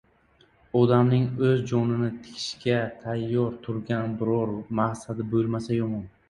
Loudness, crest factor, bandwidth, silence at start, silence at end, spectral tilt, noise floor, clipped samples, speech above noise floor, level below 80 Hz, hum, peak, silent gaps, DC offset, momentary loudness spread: -26 LUFS; 20 dB; 11 kHz; 0.75 s; 0.2 s; -7.5 dB/octave; -61 dBFS; under 0.1%; 36 dB; -58 dBFS; none; -6 dBFS; none; under 0.1%; 10 LU